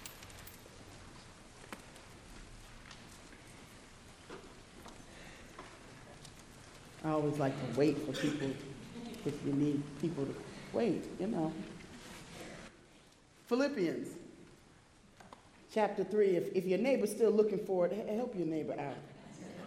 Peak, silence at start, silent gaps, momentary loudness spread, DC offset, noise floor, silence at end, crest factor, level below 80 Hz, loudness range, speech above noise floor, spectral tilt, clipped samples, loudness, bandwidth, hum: -18 dBFS; 0 s; none; 22 LU; under 0.1%; -62 dBFS; 0 s; 20 dB; -64 dBFS; 20 LU; 28 dB; -6 dB/octave; under 0.1%; -35 LUFS; 14 kHz; none